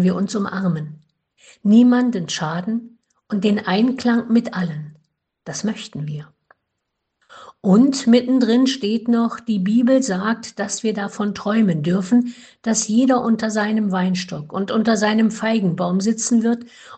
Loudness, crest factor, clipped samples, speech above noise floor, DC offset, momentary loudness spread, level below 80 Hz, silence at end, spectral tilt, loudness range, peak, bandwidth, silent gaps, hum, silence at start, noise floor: -19 LUFS; 16 dB; under 0.1%; 58 dB; under 0.1%; 12 LU; -62 dBFS; 0 s; -5.5 dB/octave; 5 LU; -4 dBFS; 9 kHz; none; none; 0 s; -77 dBFS